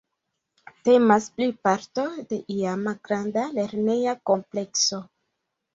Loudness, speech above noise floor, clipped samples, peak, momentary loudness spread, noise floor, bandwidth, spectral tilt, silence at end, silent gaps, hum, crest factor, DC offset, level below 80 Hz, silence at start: -24 LUFS; 57 dB; under 0.1%; -4 dBFS; 10 LU; -80 dBFS; 7.8 kHz; -4 dB/octave; 0.7 s; none; none; 22 dB; under 0.1%; -68 dBFS; 0.85 s